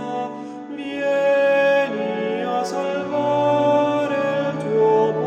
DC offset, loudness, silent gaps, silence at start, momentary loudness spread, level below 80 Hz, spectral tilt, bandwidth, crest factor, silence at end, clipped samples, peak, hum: under 0.1%; -20 LUFS; none; 0 s; 11 LU; -72 dBFS; -6 dB/octave; 9.2 kHz; 12 dB; 0 s; under 0.1%; -8 dBFS; none